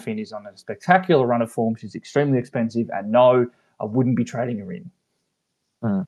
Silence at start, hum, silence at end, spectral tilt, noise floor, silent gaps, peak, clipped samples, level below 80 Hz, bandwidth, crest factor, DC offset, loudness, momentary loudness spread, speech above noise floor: 0 s; none; 0 s; -7.5 dB/octave; -76 dBFS; none; 0 dBFS; under 0.1%; -72 dBFS; 12 kHz; 22 dB; under 0.1%; -21 LUFS; 17 LU; 55 dB